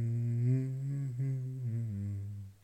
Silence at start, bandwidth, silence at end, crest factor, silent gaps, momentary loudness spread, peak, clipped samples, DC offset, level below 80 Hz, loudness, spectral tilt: 0 s; 8.6 kHz; 0.1 s; 14 dB; none; 8 LU; -22 dBFS; under 0.1%; under 0.1%; -68 dBFS; -36 LUFS; -10 dB/octave